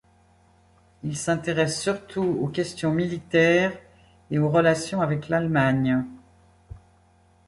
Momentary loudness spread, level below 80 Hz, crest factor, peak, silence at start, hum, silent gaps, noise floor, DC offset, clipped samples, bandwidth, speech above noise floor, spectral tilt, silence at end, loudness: 9 LU; -54 dBFS; 18 dB; -6 dBFS; 1.05 s; none; none; -59 dBFS; under 0.1%; under 0.1%; 11.5 kHz; 36 dB; -6 dB/octave; 0.7 s; -24 LUFS